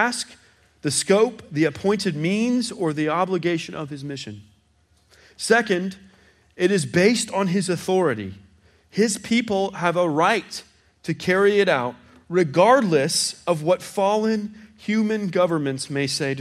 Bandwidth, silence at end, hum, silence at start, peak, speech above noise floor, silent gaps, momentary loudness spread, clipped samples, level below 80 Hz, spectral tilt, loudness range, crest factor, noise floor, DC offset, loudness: 15 kHz; 0 s; none; 0 s; -2 dBFS; 40 dB; none; 14 LU; under 0.1%; -64 dBFS; -4.5 dB/octave; 5 LU; 20 dB; -61 dBFS; under 0.1%; -21 LUFS